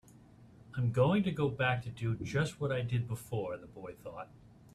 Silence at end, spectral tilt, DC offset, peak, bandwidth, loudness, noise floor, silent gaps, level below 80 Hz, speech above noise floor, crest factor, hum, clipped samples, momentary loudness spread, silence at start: 0.5 s; -7 dB/octave; under 0.1%; -16 dBFS; 13.5 kHz; -34 LUFS; -58 dBFS; none; -60 dBFS; 24 dB; 18 dB; none; under 0.1%; 17 LU; 0.4 s